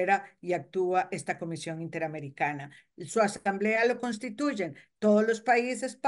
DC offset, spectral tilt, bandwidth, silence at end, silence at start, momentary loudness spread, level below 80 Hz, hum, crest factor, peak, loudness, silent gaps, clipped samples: under 0.1%; -5 dB/octave; 11.5 kHz; 0 s; 0 s; 11 LU; -76 dBFS; none; 18 dB; -12 dBFS; -29 LUFS; none; under 0.1%